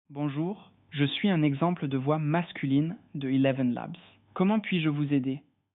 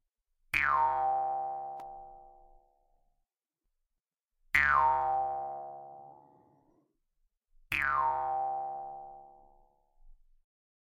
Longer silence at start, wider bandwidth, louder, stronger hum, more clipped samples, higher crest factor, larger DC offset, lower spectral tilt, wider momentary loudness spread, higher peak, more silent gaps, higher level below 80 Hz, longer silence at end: second, 0.1 s vs 0.55 s; second, 4.1 kHz vs 11.5 kHz; about the same, -28 LUFS vs -30 LUFS; neither; neither; second, 16 dB vs 26 dB; neither; first, -6 dB/octave vs -3.5 dB/octave; second, 13 LU vs 22 LU; about the same, -12 dBFS vs -10 dBFS; neither; second, -70 dBFS vs -60 dBFS; second, 0.4 s vs 0.7 s